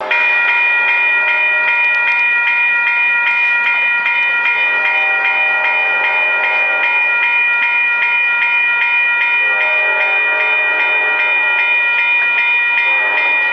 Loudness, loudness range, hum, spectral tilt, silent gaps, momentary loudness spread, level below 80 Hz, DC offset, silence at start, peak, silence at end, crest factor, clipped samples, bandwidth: -11 LUFS; 1 LU; none; -1 dB/octave; none; 1 LU; -76 dBFS; under 0.1%; 0 s; -2 dBFS; 0 s; 12 dB; under 0.1%; 7 kHz